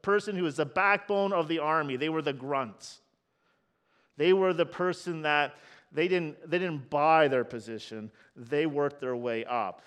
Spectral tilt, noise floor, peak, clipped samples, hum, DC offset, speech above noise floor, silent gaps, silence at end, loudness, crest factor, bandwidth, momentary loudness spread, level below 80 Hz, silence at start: -6 dB/octave; -73 dBFS; -10 dBFS; under 0.1%; none; under 0.1%; 45 dB; none; 0.1 s; -29 LUFS; 20 dB; 10.5 kHz; 15 LU; -76 dBFS; 0.05 s